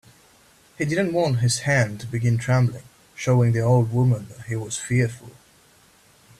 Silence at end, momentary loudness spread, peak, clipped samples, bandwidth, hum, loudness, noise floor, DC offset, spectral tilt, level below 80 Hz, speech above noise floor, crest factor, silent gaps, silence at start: 1.1 s; 10 LU; -8 dBFS; under 0.1%; 13 kHz; none; -22 LUFS; -55 dBFS; under 0.1%; -6 dB/octave; -54 dBFS; 34 dB; 14 dB; none; 0.8 s